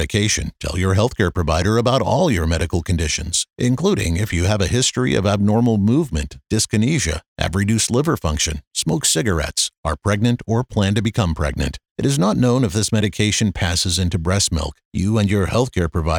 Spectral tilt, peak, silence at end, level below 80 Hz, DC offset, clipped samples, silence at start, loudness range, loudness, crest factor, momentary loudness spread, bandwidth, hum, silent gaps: -4.5 dB/octave; 0 dBFS; 0 s; -34 dBFS; under 0.1%; under 0.1%; 0 s; 1 LU; -19 LUFS; 18 dB; 6 LU; 18 kHz; none; 7.28-7.36 s, 8.67-8.71 s, 9.77-9.83 s, 11.91-11.95 s, 14.85-14.91 s